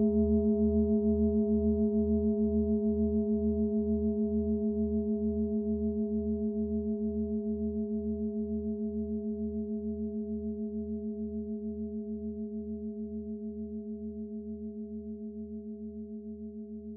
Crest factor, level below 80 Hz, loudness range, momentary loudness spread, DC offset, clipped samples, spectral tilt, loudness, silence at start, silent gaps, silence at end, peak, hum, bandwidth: 14 dB; -46 dBFS; 11 LU; 13 LU; under 0.1%; under 0.1%; -16 dB/octave; -32 LUFS; 0 s; none; 0 s; -18 dBFS; none; 1 kHz